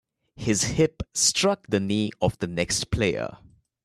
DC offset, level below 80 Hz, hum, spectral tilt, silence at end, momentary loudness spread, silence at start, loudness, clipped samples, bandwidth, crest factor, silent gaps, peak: under 0.1%; -46 dBFS; none; -3.5 dB/octave; 0.5 s; 8 LU; 0.4 s; -24 LUFS; under 0.1%; 13.5 kHz; 20 dB; none; -6 dBFS